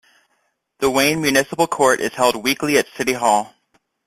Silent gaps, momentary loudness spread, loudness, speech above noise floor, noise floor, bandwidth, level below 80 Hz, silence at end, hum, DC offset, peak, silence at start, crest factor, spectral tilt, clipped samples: none; 5 LU; -18 LUFS; 50 dB; -68 dBFS; 16 kHz; -56 dBFS; 0.6 s; none; under 0.1%; -2 dBFS; 0.8 s; 18 dB; -3 dB/octave; under 0.1%